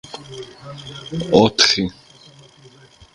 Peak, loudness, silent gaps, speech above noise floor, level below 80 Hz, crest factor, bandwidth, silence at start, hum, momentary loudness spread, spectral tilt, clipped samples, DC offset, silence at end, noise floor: 0 dBFS; -16 LUFS; none; 29 dB; -50 dBFS; 22 dB; 11.5 kHz; 0.15 s; none; 23 LU; -3.5 dB/octave; under 0.1%; under 0.1%; 1.25 s; -47 dBFS